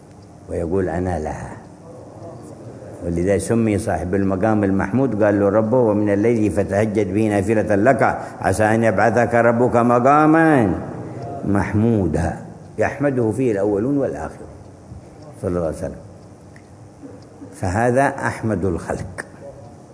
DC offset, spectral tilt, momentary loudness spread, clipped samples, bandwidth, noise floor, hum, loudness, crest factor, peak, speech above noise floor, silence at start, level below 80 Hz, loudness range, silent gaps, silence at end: under 0.1%; -7.5 dB/octave; 21 LU; under 0.1%; 11 kHz; -42 dBFS; none; -18 LUFS; 20 dB; 0 dBFS; 24 dB; 0.1 s; -44 dBFS; 9 LU; none; 0 s